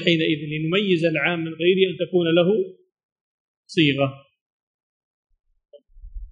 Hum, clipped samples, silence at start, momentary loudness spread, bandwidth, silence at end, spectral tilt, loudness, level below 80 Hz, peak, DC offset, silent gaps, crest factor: none; under 0.1%; 0 s; 6 LU; 9.4 kHz; 0 s; -7 dB/octave; -21 LUFS; -48 dBFS; -4 dBFS; under 0.1%; 3.03-3.63 s, 4.41-5.23 s; 18 dB